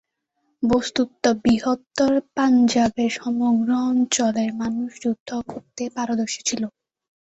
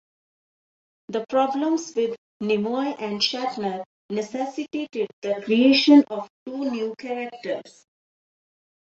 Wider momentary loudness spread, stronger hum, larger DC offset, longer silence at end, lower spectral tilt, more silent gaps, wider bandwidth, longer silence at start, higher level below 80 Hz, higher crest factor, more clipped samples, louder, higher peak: second, 10 LU vs 15 LU; neither; neither; second, 0.7 s vs 1.2 s; about the same, -4 dB/octave vs -4.5 dB/octave; second, 5.20-5.26 s vs 2.18-2.40 s, 3.86-4.09 s, 5.13-5.22 s, 6.30-6.46 s; about the same, 8.2 kHz vs 7.8 kHz; second, 0.6 s vs 1.1 s; first, -54 dBFS vs -72 dBFS; about the same, 16 dB vs 20 dB; neither; about the same, -22 LUFS vs -23 LUFS; about the same, -6 dBFS vs -4 dBFS